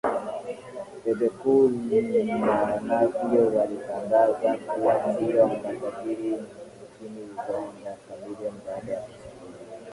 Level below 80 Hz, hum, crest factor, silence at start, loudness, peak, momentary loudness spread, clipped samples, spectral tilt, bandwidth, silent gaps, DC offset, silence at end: -62 dBFS; none; 16 dB; 0.05 s; -25 LUFS; -8 dBFS; 20 LU; under 0.1%; -7 dB/octave; 11.5 kHz; none; under 0.1%; 0 s